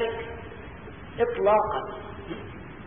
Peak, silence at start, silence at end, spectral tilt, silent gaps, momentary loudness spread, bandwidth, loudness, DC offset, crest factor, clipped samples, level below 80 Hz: -10 dBFS; 0 s; 0 s; -10 dB/octave; none; 19 LU; 3.7 kHz; -27 LUFS; 0.3%; 18 dB; under 0.1%; -50 dBFS